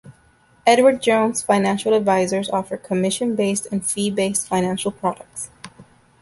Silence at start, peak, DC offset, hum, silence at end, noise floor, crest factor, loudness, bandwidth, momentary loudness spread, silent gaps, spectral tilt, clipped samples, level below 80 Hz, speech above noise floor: 0.05 s; -2 dBFS; under 0.1%; none; 0.4 s; -55 dBFS; 20 dB; -19 LUFS; 12 kHz; 10 LU; none; -4 dB/octave; under 0.1%; -58 dBFS; 36 dB